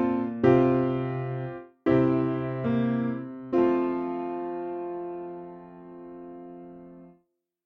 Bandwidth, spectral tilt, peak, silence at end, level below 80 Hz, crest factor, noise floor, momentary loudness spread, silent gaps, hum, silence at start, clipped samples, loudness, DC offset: 5.2 kHz; -10 dB/octave; -8 dBFS; 0.55 s; -58 dBFS; 20 dB; -71 dBFS; 22 LU; none; none; 0 s; under 0.1%; -27 LUFS; under 0.1%